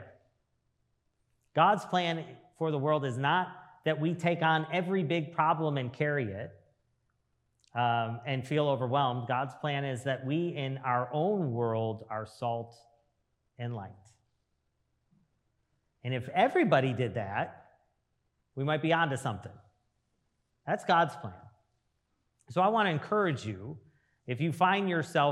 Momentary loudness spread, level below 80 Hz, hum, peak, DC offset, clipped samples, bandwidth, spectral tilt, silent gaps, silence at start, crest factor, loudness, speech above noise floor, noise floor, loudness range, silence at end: 14 LU; -78 dBFS; none; -10 dBFS; under 0.1%; under 0.1%; 12.5 kHz; -6.5 dB/octave; none; 0 s; 22 dB; -31 LUFS; 48 dB; -78 dBFS; 6 LU; 0 s